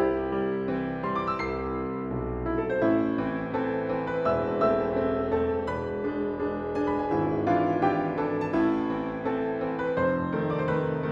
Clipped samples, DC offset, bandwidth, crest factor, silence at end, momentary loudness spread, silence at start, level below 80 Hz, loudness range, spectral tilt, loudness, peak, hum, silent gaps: under 0.1%; under 0.1%; 7.4 kHz; 16 dB; 0 s; 6 LU; 0 s; -48 dBFS; 2 LU; -9 dB/octave; -28 LUFS; -12 dBFS; none; none